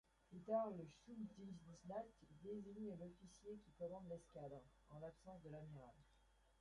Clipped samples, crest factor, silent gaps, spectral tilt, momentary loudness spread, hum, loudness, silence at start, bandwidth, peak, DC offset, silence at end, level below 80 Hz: under 0.1%; 22 dB; none; -7.5 dB/octave; 15 LU; none; -54 LUFS; 0.3 s; 11 kHz; -32 dBFS; under 0.1%; 0.1 s; -76 dBFS